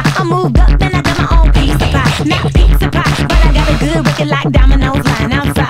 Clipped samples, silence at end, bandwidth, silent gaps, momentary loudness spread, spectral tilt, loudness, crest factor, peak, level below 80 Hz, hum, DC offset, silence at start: 0.6%; 0 s; 14.5 kHz; none; 2 LU; -6 dB/octave; -11 LUFS; 10 dB; 0 dBFS; -12 dBFS; none; under 0.1%; 0 s